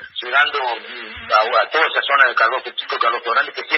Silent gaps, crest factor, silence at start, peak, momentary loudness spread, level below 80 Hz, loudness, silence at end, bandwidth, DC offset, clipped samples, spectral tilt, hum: none; 18 dB; 0 s; 0 dBFS; 10 LU; -60 dBFS; -17 LUFS; 0 s; 6.8 kHz; under 0.1%; under 0.1%; -2.5 dB/octave; none